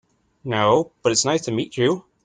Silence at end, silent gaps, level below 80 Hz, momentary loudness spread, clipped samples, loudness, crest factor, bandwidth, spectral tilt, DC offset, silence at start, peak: 0.25 s; none; -58 dBFS; 8 LU; under 0.1%; -21 LUFS; 18 dB; 9.8 kHz; -4 dB/octave; under 0.1%; 0.45 s; -4 dBFS